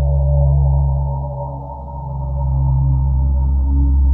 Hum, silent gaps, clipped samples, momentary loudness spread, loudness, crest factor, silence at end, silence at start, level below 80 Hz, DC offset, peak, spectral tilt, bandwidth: none; none; under 0.1%; 12 LU; -18 LUFS; 10 dB; 0 s; 0 s; -16 dBFS; under 0.1%; -4 dBFS; -15 dB/octave; 1.3 kHz